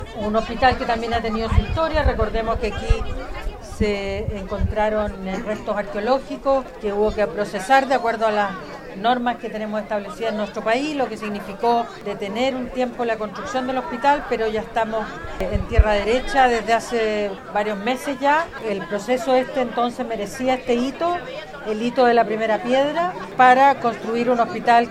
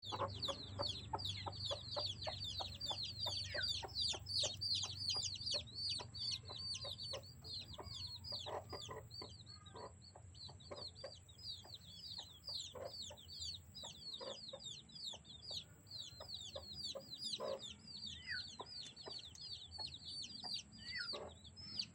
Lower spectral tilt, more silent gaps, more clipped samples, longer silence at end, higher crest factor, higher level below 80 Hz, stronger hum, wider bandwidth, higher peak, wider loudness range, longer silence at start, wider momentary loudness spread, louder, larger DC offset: first, -5.5 dB/octave vs -2 dB/octave; neither; neither; about the same, 0 s vs 0 s; about the same, 20 dB vs 20 dB; first, -32 dBFS vs -68 dBFS; neither; about the same, 15 kHz vs 16.5 kHz; first, 0 dBFS vs -28 dBFS; second, 5 LU vs 10 LU; about the same, 0 s vs 0 s; about the same, 10 LU vs 12 LU; first, -21 LUFS vs -45 LUFS; neither